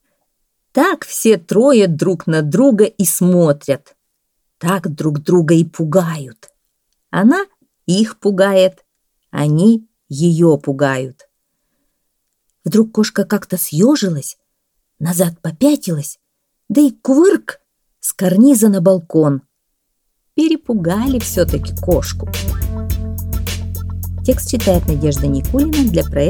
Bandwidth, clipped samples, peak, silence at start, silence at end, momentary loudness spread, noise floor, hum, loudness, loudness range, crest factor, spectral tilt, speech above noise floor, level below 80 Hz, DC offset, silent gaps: 20 kHz; under 0.1%; 0 dBFS; 0.75 s; 0 s; 11 LU; -69 dBFS; none; -15 LUFS; 5 LU; 14 dB; -6 dB/octave; 56 dB; -32 dBFS; under 0.1%; none